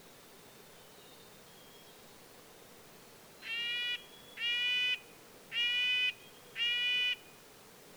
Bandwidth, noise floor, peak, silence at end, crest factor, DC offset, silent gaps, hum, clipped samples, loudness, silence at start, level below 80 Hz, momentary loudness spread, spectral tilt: over 20 kHz; -57 dBFS; -22 dBFS; 0 s; 16 dB; under 0.1%; none; none; under 0.1%; -32 LUFS; 0 s; -78 dBFS; 25 LU; 0 dB/octave